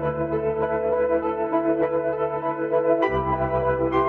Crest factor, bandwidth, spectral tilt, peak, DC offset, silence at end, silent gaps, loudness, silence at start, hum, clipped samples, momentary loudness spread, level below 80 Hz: 14 dB; 4.5 kHz; -9.5 dB/octave; -8 dBFS; under 0.1%; 0 s; none; -23 LUFS; 0 s; none; under 0.1%; 4 LU; -44 dBFS